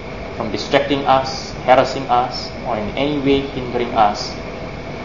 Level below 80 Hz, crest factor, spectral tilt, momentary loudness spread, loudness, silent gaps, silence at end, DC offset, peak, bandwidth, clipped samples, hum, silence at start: -38 dBFS; 18 dB; -5 dB/octave; 12 LU; -18 LUFS; none; 0 s; 0.8%; 0 dBFS; 7.4 kHz; under 0.1%; none; 0 s